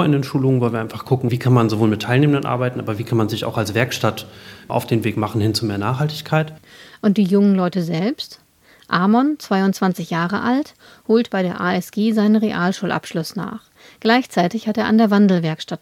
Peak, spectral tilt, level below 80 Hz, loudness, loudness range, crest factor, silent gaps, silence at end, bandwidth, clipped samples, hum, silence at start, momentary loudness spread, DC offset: 0 dBFS; -6.5 dB/octave; -60 dBFS; -19 LUFS; 3 LU; 18 dB; none; 0.05 s; 16 kHz; under 0.1%; none; 0 s; 10 LU; under 0.1%